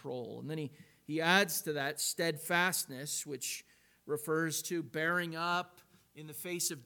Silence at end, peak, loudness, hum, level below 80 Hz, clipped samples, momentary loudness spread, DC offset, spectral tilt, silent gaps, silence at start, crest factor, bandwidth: 0 s; -12 dBFS; -34 LUFS; none; -82 dBFS; under 0.1%; 14 LU; under 0.1%; -3 dB/octave; none; 0.05 s; 24 dB; 19 kHz